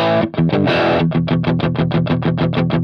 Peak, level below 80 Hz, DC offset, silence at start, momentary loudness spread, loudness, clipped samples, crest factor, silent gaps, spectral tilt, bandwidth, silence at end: -4 dBFS; -44 dBFS; under 0.1%; 0 s; 3 LU; -16 LUFS; under 0.1%; 10 dB; none; -9 dB/octave; 6 kHz; 0 s